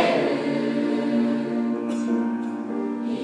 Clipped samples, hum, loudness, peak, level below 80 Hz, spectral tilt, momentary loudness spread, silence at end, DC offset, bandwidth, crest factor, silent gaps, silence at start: under 0.1%; none; -25 LUFS; -8 dBFS; -80 dBFS; -6 dB/octave; 6 LU; 0 s; under 0.1%; 10 kHz; 16 dB; none; 0 s